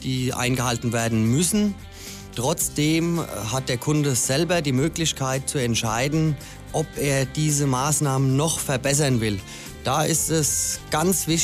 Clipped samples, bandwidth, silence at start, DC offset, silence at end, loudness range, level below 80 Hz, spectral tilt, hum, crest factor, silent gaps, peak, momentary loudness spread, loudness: under 0.1%; 16 kHz; 0 s; under 0.1%; 0 s; 1 LU; -44 dBFS; -4 dB/octave; none; 16 dB; none; -8 dBFS; 7 LU; -22 LUFS